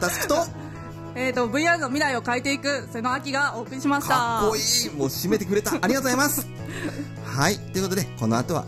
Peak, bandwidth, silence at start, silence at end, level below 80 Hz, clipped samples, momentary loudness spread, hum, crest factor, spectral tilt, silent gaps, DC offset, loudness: -6 dBFS; 15.5 kHz; 0 s; 0 s; -50 dBFS; under 0.1%; 10 LU; none; 20 dB; -3.5 dB/octave; none; under 0.1%; -24 LUFS